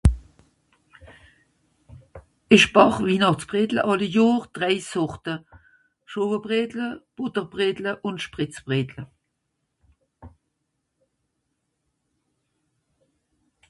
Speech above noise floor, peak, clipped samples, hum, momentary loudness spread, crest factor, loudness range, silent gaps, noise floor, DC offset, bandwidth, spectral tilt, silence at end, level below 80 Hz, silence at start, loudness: 55 dB; 0 dBFS; under 0.1%; none; 16 LU; 24 dB; 13 LU; none; -77 dBFS; under 0.1%; 11.5 kHz; -5.5 dB/octave; 3.4 s; -38 dBFS; 0.05 s; -22 LUFS